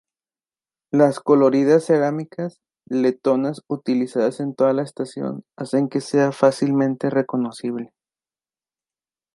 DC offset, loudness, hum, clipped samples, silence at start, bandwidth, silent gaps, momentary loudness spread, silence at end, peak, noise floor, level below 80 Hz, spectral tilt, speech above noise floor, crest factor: under 0.1%; -20 LUFS; none; under 0.1%; 0.95 s; 11.5 kHz; none; 13 LU; 1.5 s; -2 dBFS; under -90 dBFS; -74 dBFS; -7 dB/octave; over 70 dB; 18 dB